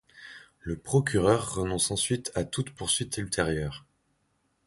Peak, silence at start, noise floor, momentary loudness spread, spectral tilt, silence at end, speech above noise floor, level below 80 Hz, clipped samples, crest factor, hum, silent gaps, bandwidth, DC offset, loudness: -10 dBFS; 0.15 s; -73 dBFS; 19 LU; -4 dB/octave; 0.9 s; 45 dB; -48 dBFS; under 0.1%; 20 dB; none; none; 12 kHz; under 0.1%; -28 LUFS